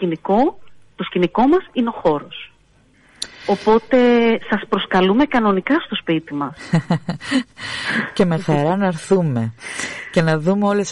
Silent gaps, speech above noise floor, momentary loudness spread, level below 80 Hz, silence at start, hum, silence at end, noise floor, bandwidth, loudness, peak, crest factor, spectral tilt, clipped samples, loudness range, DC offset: none; 36 dB; 11 LU; -50 dBFS; 0 s; none; 0 s; -54 dBFS; 11.5 kHz; -18 LUFS; -4 dBFS; 14 dB; -6 dB/octave; under 0.1%; 3 LU; under 0.1%